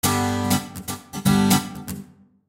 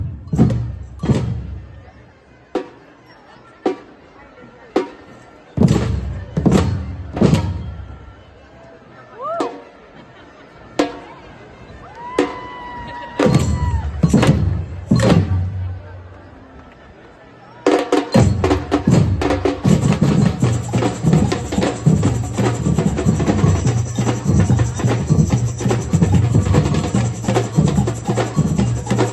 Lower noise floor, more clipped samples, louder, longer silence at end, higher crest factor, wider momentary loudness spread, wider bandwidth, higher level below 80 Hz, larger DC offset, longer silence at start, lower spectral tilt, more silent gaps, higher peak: about the same, -43 dBFS vs -46 dBFS; neither; second, -22 LUFS vs -18 LUFS; first, 0.45 s vs 0 s; about the same, 18 dB vs 18 dB; about the same, 16 LU vs 15 LU; first, 17 kHz vs 12 kHz; second, -48 dBFS vs -32 dBFS; neither; about the same, 0.05 s vs 0 s; second, -4.5 dB/octave vs -7 dB/octave; neither; second, -4 dBFS vs 0 dBFS